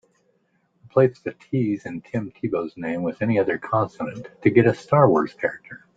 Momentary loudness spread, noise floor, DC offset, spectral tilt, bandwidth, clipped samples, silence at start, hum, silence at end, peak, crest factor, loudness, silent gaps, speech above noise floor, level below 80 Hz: 12 LU; -67 dBFS; under 0.1%; -9 dB/octave; 7.8 kHz; under 0.1%; 0.95 s; none; 0.2 s; -2 dBFS; 20 dB; -22 LUFS; none; 45 dB; -60 dBFS